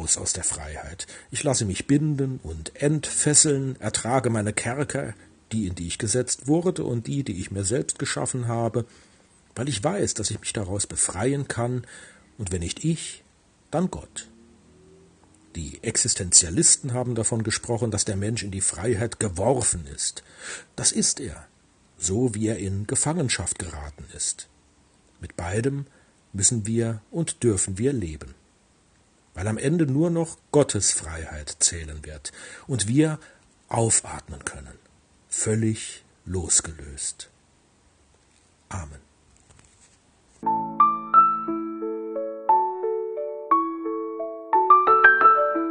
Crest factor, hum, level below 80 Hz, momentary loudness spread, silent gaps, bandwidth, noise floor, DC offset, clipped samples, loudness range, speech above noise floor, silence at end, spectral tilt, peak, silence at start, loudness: 24 dB; none; -50 dBFS; 19 LU; none; 10.5 kHz; -60 dBFS; under 0.1%; under 0.1%; 8 LU; 35 dB; 0 s; -3.5 dB/octave; 0 dBFS; 0 s; -23 LUFS